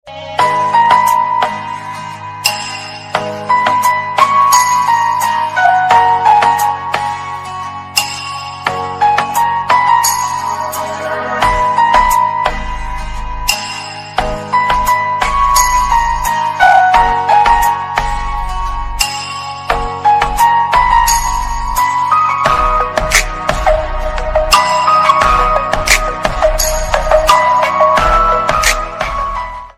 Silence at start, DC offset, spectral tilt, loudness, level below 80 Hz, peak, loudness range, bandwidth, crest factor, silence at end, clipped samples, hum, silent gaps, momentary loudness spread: 0.05 s; under 0.1%; -2 dB/octave; -12 LUFS; -24 dBFS; 0 dBFS; 4 LU; over 20 kHz; 12 dB; 0.05 s; 0.3%; none; none; 11 LU